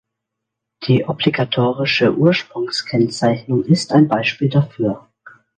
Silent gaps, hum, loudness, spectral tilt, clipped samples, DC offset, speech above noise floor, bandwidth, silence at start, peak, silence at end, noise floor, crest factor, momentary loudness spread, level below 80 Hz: none; none; -17 LUFS; -6.5 dB/octave; under 0.1%; under 0.1%; 64 dB; 9.6 kHz; 0.8 s; 0 dBFS; 0.3 s; -80 dBFS; 16 dB; 8 LU; -56 dBFS